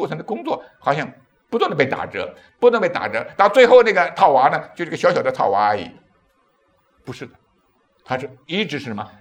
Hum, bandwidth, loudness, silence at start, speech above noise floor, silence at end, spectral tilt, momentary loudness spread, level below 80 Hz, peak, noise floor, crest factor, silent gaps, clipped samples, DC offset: none; 9.6 kHz; -18 LUFS; 0 s; 44 dB; 0.15 s; -5.5 dB/octave; 19 LU; -64 dBFS; 0 dBFS; -62 dBFS; 20 dB; none; under 0.1%; under 0.1%